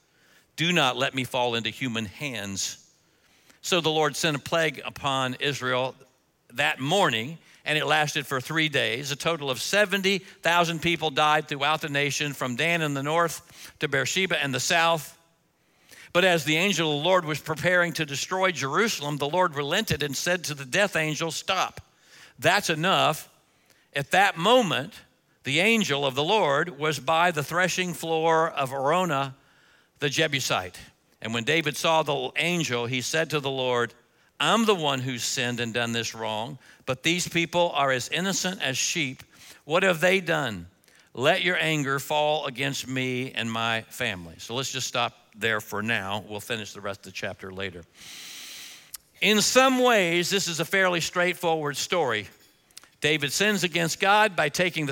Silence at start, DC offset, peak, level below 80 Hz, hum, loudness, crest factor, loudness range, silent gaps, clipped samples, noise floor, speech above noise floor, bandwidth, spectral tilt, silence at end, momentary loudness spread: 0.55 s; under 0.1%; -4 dBFS; -66 dBFS; none; -25 LUFS; 22 dB; 4 LU; none; under 0.1%; -66 dBFS; 41 dB; 17 kHz; -3 dB/octave; 0 s; 11 LU